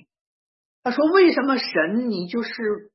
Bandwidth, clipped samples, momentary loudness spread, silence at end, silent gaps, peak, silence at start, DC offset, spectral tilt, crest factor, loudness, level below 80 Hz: 6 kHz; under 0.1%; 11 LU; 0.1 s; none; -4 dBFS; 0.85 s; under 0.1%; -7 dB/octave; 18 dB; -21 LUFS; -70 dBFS